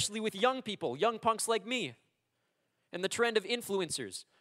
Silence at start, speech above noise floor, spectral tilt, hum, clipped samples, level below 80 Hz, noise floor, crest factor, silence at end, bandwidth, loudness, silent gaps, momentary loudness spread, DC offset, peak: 0 s; 47 dB; -2.5 dB/octave; none; under 0.1%; -78 dBFS; -80 dBFS; 20 dB; 0.2 s; 16 kHz; -33 LUFS; none; 8 LU; under 0.1%; -14 dBFS